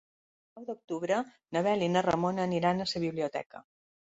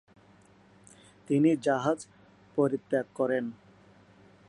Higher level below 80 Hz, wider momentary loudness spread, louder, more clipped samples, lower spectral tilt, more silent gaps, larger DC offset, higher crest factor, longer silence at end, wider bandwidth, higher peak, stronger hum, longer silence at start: first, -66 dBFS vs -74 dBFS; first, 15 LU vs 11 LU; about the same, -31 LUFS vs -29 LUFS; neither; about the same, -6 dB/octave vs -7 dB/octave; first, 0.84-0.88 s, 3.46-3.50 s vs none; neither; about the same, 18 dB vs 20 dB; second, 0.55 s vs 0.95 s; second, 8 kHz vs 11 kHz; about the same, -12 dBFS vs -12 dBFS; neither; second, 0.55 s vs 1.3 s